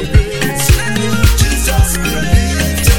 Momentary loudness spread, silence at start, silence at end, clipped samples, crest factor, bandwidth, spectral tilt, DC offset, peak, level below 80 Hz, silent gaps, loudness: 3 LU; 0 s; 0 s; 0.2%; 12 dB; 19.5 kHz; -4 dB/octave; 4%; 0 dBFS; -14 dBFS; none; -13 LUFS